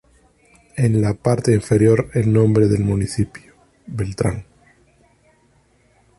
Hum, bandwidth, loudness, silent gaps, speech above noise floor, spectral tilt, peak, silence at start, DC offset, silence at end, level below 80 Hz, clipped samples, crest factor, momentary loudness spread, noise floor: none; 11.5 kHz; -18 LUFS; none; 41 dB; -7.5 dB/octave; -2 dBFS; 0.75 s; under 0.1%; 1.75 s; -42 dBFS; under 0.1%; 16 dB; 12 LU; -58 dBFS